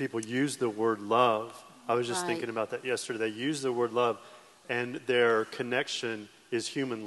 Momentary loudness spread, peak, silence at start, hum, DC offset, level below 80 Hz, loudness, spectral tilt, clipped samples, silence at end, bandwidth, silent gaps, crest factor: 9 LU; -12 dBFS; 0 s; none; under 0.1%; -82 dBFS; -30 LUFS; -4 dB/octave; under 0.1%; 0 s; 12.5 kHz; none; 20 dB